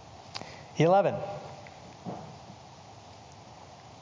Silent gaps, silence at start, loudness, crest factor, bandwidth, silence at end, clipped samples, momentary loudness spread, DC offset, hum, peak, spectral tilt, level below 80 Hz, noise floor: none; 0.05 s; -29 LUFS; 20 dB; 7.6 kHz; 0 s; under 0.1%; 26 LU; under 0.1%; none; -12 dBFS; -6.5 dB/octave; -64 dBFS; -50 dBFS